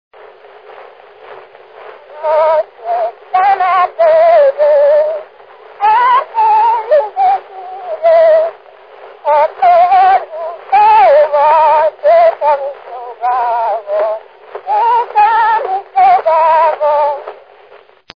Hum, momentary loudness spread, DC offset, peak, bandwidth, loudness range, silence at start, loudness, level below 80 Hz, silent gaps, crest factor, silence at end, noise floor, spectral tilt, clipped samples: none; 14 LU; 0.1%; 0 dBFS; 5.2 kHz; 5 LU; 0.7 s; -11 LUFS; -58 dBFS; none; 12 dB; 0.85 s; -42 dBFS; -4.5 dB/octave; under 0.1%